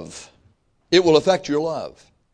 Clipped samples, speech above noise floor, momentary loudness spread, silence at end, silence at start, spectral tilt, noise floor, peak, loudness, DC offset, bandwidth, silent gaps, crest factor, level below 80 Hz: under 0.1%; 42 dB; 22 LU; 0.45 s; 0 s; -4.5 dB/octave; -60 dBFS; -2 dBFS; -19 LUFS; under 0.1%; 10 kHz; none; 20 dB; -56 dBFS